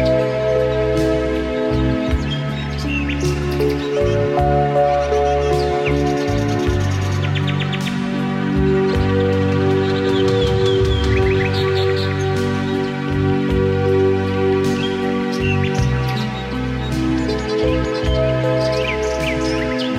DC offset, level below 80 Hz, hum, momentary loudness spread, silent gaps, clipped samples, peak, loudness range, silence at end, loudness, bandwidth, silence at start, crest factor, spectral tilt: under 0.1%; -28 dBFS; none; 4 LU; none; under 0.1%; -4 dBFS; 2 LU; 0 s; -18 LUFS; 14 kHz; 0 s; 12 dB; -6.5 dB/octave